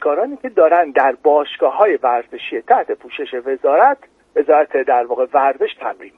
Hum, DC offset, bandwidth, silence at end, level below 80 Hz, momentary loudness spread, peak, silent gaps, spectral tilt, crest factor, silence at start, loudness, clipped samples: none; under 0.1%; 4 kHz; 0.1 s; -66 dBFS; 12 LU; 0 dBFS; none; -5.5 dB/octave; 16 dB; 0 s; -16 LUFS; under 0.1%